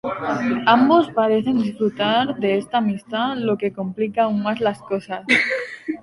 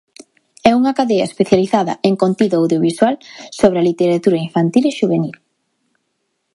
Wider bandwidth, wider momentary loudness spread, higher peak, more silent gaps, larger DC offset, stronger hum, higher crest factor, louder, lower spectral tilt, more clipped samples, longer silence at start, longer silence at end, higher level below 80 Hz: about the same, 11.5 kHz vs 11.5 kHz; first, 10 LU vs 4 LU; about the same, -2 dBFS vs 0 dBFS; neither; neither; neither; about the same, 18 dB vs 16 dB; second, -20 LUFS vs -15 LUFS; about the same, -6 dB/octave vs -6.5 dB/octave; neither; second, 0.05 s vs 0.65 s; second, 0 s vs 1.2 s; about the same, -60 dBFS vs -56 dBFS